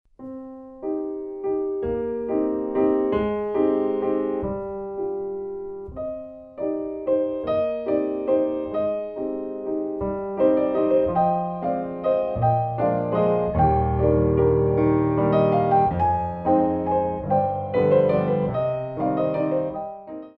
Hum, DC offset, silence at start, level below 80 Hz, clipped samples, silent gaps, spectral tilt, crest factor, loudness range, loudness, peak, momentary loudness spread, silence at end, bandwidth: none; under 0.1%; 0.2 s; -42 dBFS; under 0.1%; none; -11.5 dB/octave; 16 dB; 6 LU; -23 LUFS; -6 dBFS; 12 LU; 0.1 s; 5 kHz